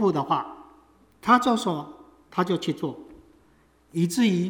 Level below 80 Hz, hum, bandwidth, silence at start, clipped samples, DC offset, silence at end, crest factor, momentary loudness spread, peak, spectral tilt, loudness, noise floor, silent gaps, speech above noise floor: -64 dBFS; none; 18 kHz; 0 s; under 0.1%; under 0.1%; 0 s; 20 dB; 15 LU; -6 dBFS; -5.5 dB/octave; -25 LUFS; -60 dBFS; none; 36 dB